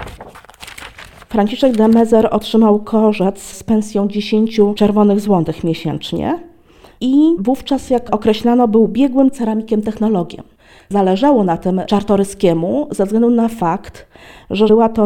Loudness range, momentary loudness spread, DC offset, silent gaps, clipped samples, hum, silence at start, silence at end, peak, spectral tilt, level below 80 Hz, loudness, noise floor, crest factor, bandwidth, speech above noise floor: 2 LU; 10 LU; under 0.1%; none; under 0.1%; none; 0 s; 0 s; -2 dBFS; -7 dB/octave; -42 dBFS; -14 LUFS; -45 dBFS; 14 dB; 14 kHz; 31 dB